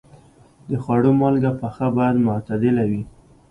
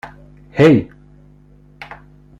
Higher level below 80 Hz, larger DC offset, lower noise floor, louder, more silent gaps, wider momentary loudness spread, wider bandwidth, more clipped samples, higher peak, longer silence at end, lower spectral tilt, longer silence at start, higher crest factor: about the same, -50 dBFS vs -46 dBFS; neither; first, -50 dBFS vs -46 dBFS; second, -20 LUFS vs -14 LUFS; neither; second, 11 LU vs 26 LU; second, 9.6 kHz vs 11 kHz; neither; second, -6 dBFS vs -2 dBFS; second, 0.4 s vs 1.55 s; first, -10 dB/octave vs -8 dB/octave; first, 0.7 s vs 0.05 s; about the same, 14 dB vs 18 dB